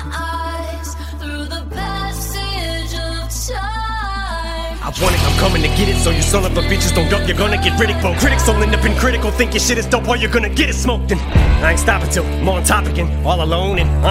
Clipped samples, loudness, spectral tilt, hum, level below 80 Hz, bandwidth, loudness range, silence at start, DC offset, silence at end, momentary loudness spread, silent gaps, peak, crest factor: under 0.1%; -16 LUFS; -4.5 dB/octave; none; -20 dBFS; 16 kHz; 8 LU; 0 s; under 0.1%; 0 s; 9 LU; none; 0 dBFS; 14 dB